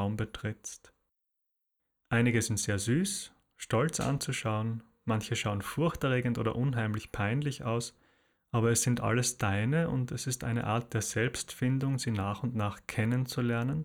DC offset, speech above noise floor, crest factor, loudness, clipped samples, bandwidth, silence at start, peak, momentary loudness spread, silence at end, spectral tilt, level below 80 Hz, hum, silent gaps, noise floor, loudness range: under 0.1%; 52 dB; 18 dB; -31 LUFS; under 0.1%; 17 kHz; 0 s; -14 dBFS; 8 LU; 0 s; -5 dB/octave; -56 dBFS; none; none; -83 dBFS; 2 LU